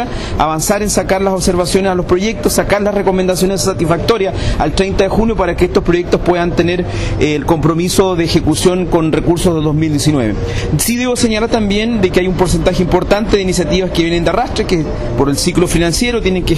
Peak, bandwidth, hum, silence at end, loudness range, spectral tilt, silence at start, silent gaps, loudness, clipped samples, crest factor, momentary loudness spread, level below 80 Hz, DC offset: -2 dBFS; 14 kHz; none; 0 s; 1 LU; -5 dB/octave; 0 s; none; -13 LUFS; under 0.1%; 12 dB; 3 LU; -24 dBFS; under 0.1%